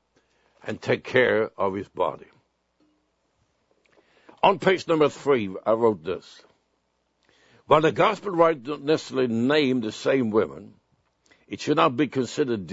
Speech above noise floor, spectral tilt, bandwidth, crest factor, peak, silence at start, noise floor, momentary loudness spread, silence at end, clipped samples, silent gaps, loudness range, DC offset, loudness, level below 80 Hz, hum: 49 dB; -5.5 dB/octave; 8 kHz; 22 dB; -2 dBFS; 0.65 s; -72 dBFS; 12 LU; 0 s; under 0.1%; none; 5 LU; under 0.1%; -23 LUFS; -66 dBFS; none